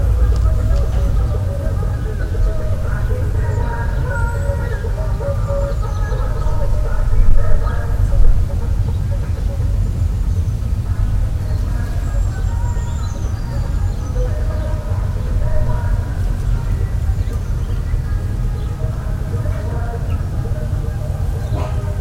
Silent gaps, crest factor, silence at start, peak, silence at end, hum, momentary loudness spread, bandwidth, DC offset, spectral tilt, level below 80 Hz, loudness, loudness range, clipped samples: none; 16 dB; 0 s; 0 dBFS; 0 s; none; 4 LU; 13 kHz; under 0.1%; -7.5 dB/octave; -18 dBFS; -20 LUFS; 2 LU; under 0.1%